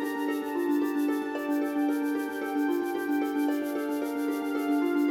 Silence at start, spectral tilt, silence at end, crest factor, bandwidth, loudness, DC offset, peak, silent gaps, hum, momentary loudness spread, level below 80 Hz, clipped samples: 0 s; -4 dB/octave; 0 s; 12 dB; 17 kHz; -29 LUFS; under 0.1%; -16 dBFS; none; none; 3 LU; -74 dBFS; under 0.1%